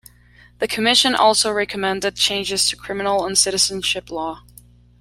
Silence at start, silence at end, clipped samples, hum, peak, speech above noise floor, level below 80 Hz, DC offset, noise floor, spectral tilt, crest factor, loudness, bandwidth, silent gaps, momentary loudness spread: 0.6 s; 0.6 s; under 0.1%; 60 Hz at -45 dBFS; 0 dBFS; 30 dB; -50 dBFS; under 0.1%; -50 dBFS; -1 dB/octave; 20 dB; -18 LUFS; 16.5 kHz; none; 13 LU